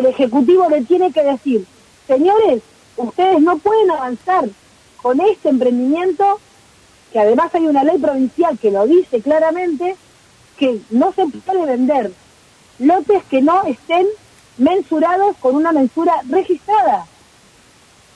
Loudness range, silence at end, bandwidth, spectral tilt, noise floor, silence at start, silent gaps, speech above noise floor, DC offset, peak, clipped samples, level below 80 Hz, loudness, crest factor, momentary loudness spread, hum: 2 LU; 1.1 s; 11 kHz; -6 dB/octave; -48 dBFS; 0 s; none; 34 dB; under 0.1%; -4 dBFS; under 0.1%; -58 dBFS; -15 LUFS; 12 dB; 8 LU; none